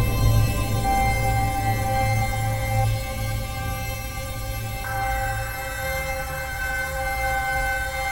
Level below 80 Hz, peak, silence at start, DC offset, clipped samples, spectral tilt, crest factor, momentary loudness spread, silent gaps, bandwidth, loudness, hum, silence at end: -30 dBFS; -6 dBFS; 0 s; 0.5%; under 0.1%; -4.5 dB/octave; 16 dB; 8 LU; none; 18.5 kHz; -25 LUFS; none; 0 s